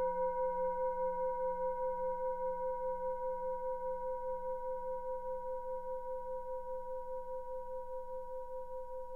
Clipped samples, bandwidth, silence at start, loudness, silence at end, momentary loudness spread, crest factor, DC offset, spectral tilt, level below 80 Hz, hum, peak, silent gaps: under 0.1%; 2.3 kHz; 0 s; -40 LUFS; 0 s; 9 LU; 12 dB; under 0.1%; -7.5 dB/octave; -56 dBFS; none; -26 dBFS; none